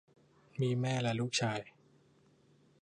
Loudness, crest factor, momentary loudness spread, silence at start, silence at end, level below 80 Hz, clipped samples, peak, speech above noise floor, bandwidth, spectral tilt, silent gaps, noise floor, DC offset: -35 LUFS; 18 dB; 13 LU; 0.55 s; 1.15 s; -74 dBFS; under 0.1%; -20 dBFS; 34 dB; 10.5 kHz; -5 dB/octave; none; -67 dBFS; under 0.1%